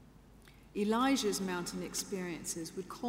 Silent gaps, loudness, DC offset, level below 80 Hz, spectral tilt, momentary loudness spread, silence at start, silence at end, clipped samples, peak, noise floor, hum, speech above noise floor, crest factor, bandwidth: none; -35 LUFS; under 0.1%; -62 dBFS; -3.5 dB/octave; 10 LU; 0 s; 0 s; under 0.1%; -20 dBFS; -58 dBFS; none; 23 dB; 16 dB; 16 kHz